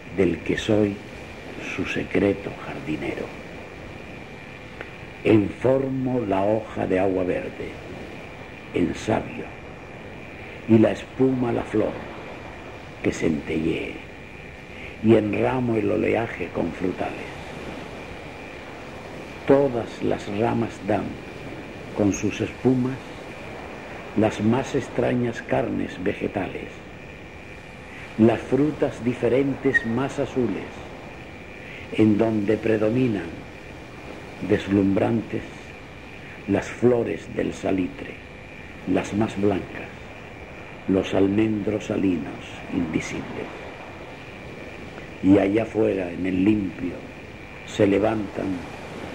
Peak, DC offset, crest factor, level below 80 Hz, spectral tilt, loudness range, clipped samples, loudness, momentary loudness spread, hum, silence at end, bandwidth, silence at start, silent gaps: -4 dBFS; 0.2%; 22 dB; -48 dBFS; -7 dB/octave; 5 LU; under 0.1%; -24 LUFS; 18 LU; none; 0 s; 11 kHz; 0 s; none